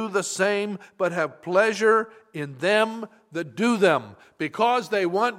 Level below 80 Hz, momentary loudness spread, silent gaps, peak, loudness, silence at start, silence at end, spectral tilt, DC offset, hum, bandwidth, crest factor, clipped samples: -76 dBFS; 14 LU; none; -6 dBFS; -23 LUFS; 0 s; 0 s; -4 dB/octave; under 0.1%; none; 15 kHz; 18 dB; under 0.1%